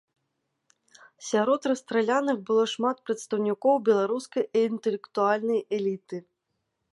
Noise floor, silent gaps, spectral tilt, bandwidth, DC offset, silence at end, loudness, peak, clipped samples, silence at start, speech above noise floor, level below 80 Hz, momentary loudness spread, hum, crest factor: -79 dBFS; none; -5 dB/octave; 11.5 kHz; under 0.1%; 0.7 s; -26 LUFS; -10 dBFS; under 0.1%; 1.2 s; 54 dB; -82 dBFS; 7 LU; none; 16 dB